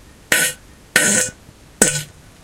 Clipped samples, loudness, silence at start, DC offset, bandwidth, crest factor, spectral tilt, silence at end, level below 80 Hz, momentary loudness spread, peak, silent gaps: under 0.1%; -16 LUFS; 0.3 s; under 0.1%; 17 kHz; 20 dB; -1 dB/octave; 0.35 s; -48 dBFS; 14 LU; 0 dBFS; none